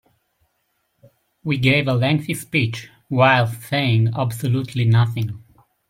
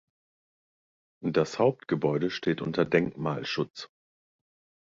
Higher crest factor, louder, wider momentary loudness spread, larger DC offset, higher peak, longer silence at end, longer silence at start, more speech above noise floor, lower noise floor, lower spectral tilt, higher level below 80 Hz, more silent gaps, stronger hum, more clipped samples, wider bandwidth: about the same, 18 dB vs 22 dB; first, -19 LUFS vs -28 LUFS; about the same, 11 LU vs 10 LU; neither; first, -2 dBFS vs -8 dBFS; second, 0.5 s vs 1 s; first, 1.45 s vs 1.2 s; second, 51 dB vs over 62 dB; second, -70 dBFS vs under -90 dBFS; about the same, -6.5 dB/octave vs -6.5 dB/octave; first, -56 dBFS vs -66 dBFS; second, none vs 3.70-3.74 s; neither; neither; first, 16 kHz vs 7.8 kHz